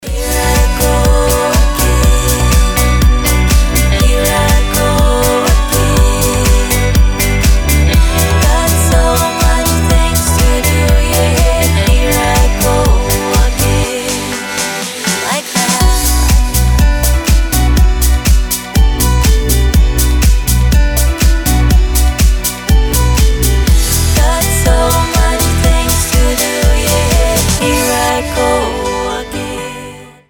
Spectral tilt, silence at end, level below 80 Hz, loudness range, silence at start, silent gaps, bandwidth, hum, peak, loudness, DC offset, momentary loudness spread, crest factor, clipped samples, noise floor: -4 dB/octave; 0.2 s; -12 dBFS; 2 LU; 0 s; none; over 20 kHz; none; 0 dBFS; -11 LUFS; under 0.1%; 4 LU; 10 dB; under 0.1%; -30 dBFS